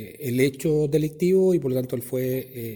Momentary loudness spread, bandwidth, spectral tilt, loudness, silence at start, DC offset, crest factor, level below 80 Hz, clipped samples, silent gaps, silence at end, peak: 8 LU; 19 kHz; -7 dB/octave; -23 LUFS; 0 s; under 0.1%; 14 dB; -56 dBFS; under 0.1%; none; 0 s; -8 dBFS